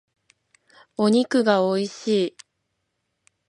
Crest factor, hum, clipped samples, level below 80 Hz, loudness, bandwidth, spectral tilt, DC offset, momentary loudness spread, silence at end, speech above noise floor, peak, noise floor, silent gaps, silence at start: 20 dB; none; under 0.1%; -74 dBFS; -22 LUFS; 11 kHz; -5.5 dB/octave; under 0.1%; 8 LU; 1.2 s; 56 dB; -4 dBFS; -76 dBFS; none; 1 s